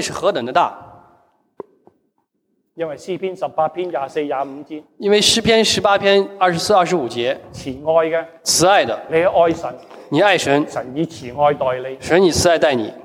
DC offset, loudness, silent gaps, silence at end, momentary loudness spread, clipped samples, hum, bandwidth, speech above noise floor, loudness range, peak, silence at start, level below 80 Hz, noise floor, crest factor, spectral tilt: under 0.1%; -17 LUFS; none; 0.05 s; 12 LU; under 0.1%; none; 16.5 kHz; 51 dB; 10 LU; -2 dBFS; 0 s; -50 dBFS; -68 dBFS; 16 dB; -3.5 dB/octave